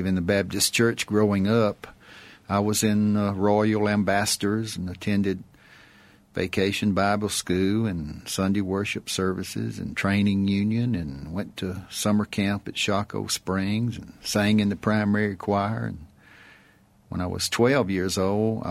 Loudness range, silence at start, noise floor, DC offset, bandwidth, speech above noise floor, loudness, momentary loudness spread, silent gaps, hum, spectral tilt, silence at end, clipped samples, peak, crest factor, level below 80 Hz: 3 LU; 0 s; -57 dBFS; under 0.1%; 15.5 kHz; 33 dB; -25 LUFS; 10 LU; none; none; -5 dB/octave; 0 s; under 0.1%; -8 dBFS; 18 dB; -52 dBFS